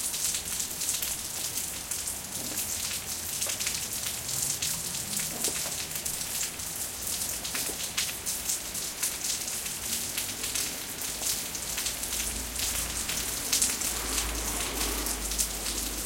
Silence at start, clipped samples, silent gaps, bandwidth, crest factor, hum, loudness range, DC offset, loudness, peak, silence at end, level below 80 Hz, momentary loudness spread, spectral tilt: 0 s; under 0.1%; none; 17 kHz; 28 dB; none; 2 LU; under 0.1%; -29 LUFS; -4 dBFS; 0 s; -46 dBFS; 4 LU; -0.5 dB/octave